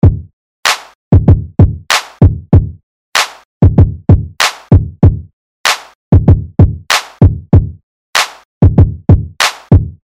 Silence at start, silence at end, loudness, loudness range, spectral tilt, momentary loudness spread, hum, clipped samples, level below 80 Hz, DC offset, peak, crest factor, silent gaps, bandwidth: 0.05 s; 0.15 s; -11 LUFS; 1 LU; -5.5 dB/octave; 7 LU; none; 3%; -20 dBFS; 0.1%; 0 dBFS; 10 dB; 0.33-0.63 s, 0.95-1.11 s, 2.83-3.12 s, 3.45-3.61 s, 5.33-5.64 s, 5.95-6.11 s, 7.83-8.13 s, 8.45-8.61 s; 15.5 kHz